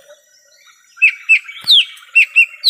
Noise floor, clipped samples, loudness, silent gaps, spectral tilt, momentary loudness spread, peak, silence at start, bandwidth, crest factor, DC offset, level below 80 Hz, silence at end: -50 dBFS; under 0.1%; -10 LUFS; none; 3.5 dB/octave; 3 LU; -2 dBFS; 1 s; 16 kHz; 14 dB; under 0.1%; -78 dBFS; 0 s